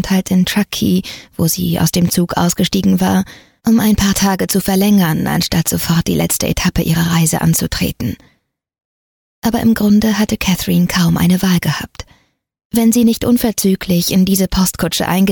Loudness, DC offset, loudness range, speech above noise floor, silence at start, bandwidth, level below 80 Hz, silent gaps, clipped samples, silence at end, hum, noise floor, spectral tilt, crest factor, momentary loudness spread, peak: -14 LUFS; under 0.1%; 3 LU; over 76 dB; 0 s; 19.5 kHz; -34 dBFS; 8.85-9.42 s, 12.65-12.70 s; under 0.1%; 0 s; none; under -90 dBFS; -5 dB/octave; 12 dB; 6 LU; -2 dBFS